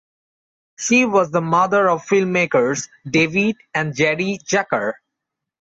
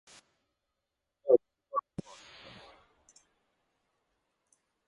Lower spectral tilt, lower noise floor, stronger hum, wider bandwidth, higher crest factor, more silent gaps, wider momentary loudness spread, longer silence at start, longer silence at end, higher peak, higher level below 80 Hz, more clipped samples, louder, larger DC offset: second, -4.5 dB/octave vs -6.5 dB/octave; second, -82 dBFS vs -86 dBFS; neither; second, 8 kHz vs 10.5 kHz; second, 16 dB vs 28 dB; neither; second, 8 LU vs 24 LU; second, 0.8 s vs 1.25 s; second, 0.85 s vs 3.1 s; first, -4 dBFS vs -10 dBFS; first, -60 dBFS vs -72 dBFS; neither; first, -18 LUFS vs -31 LUFS; neither